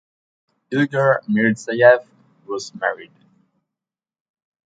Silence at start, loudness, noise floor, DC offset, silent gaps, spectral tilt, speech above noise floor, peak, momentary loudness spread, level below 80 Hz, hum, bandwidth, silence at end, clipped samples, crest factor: 0.7 s; -18 LUFS; -88 dBFS; under 0.1%; none; -6 dB/octave; 70 dB; 0 dBFS; 16 LU; -72 dBFS; none; 9.2 kHz; 1.65 s; under 0.1%; 20 dB